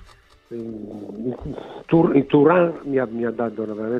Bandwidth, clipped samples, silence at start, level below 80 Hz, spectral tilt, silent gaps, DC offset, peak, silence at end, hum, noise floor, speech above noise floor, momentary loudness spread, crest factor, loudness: 5.6 kHz; under 0.1%; 0.5 s; -52 dBFS; -9.5 dB/octave; none; under 0.1%; -4 dBFS; 0 s; none; -49 dBFS; 29 dB; 18 LU; 18 dB; -20 LUFS